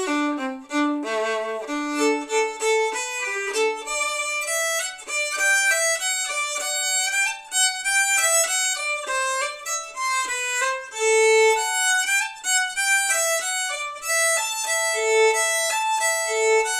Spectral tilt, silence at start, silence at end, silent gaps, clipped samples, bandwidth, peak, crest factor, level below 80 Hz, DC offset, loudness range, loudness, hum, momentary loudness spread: 2 dB/octave; 0 s; 0 s; none; under 0.1%; 16 kHz; -8 dBFS; 14 dB; -68 dBFS; under 0.1%; 4 LU; -21 LUFS; none; 8 LU